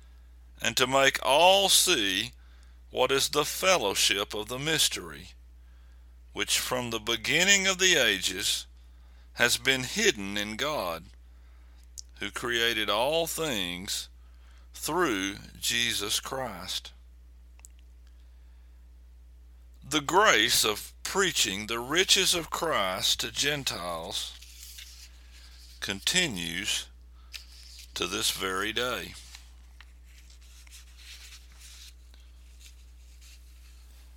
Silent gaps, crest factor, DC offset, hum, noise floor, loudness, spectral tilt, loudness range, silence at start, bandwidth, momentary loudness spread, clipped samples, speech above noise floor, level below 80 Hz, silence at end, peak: none; 26 dB; under 0.1%; none; -51 dBFS; -26 LUFS; -1.5 dB/octave; 9 LU; 0 s; 17.5 kHz; 23 LU; under 0.1%; 24 dB; -50 dBFS; 0 s; -4 dBFS